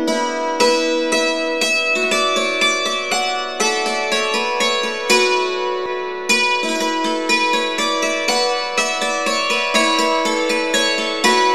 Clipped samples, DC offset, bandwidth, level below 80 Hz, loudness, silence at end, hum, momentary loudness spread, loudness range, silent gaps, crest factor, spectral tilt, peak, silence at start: under 0.1%; 1%; 14 kHz; -62 dBFS; -17 LUFS; 0 s; none; 4 LU; 1 LU; none; 18 dB; -1 dB/octave; 0 dBFS; 0 s